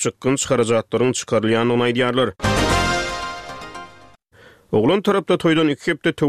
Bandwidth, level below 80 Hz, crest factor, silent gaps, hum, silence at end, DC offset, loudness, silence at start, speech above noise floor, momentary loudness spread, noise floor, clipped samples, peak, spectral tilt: 14.5 kHz; -38 dBFS; 14 dB; none; none; 0 s; 0.2%; -19 LUFS; 0 s; 32 dB; 12 LU; -50 dBFS; under 0.1%; -4 dBFS; -4.5 dB/octave